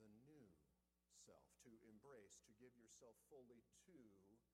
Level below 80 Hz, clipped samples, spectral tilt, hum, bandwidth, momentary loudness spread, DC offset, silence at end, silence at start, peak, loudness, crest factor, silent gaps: -90 dBFS; under 0.1%; -4 dB/octave; none; 13.5 kHz; 3 LU; under 0.1%; 0 s; 0 s; -52 dBFS; -68 LUFS; 18 dB; none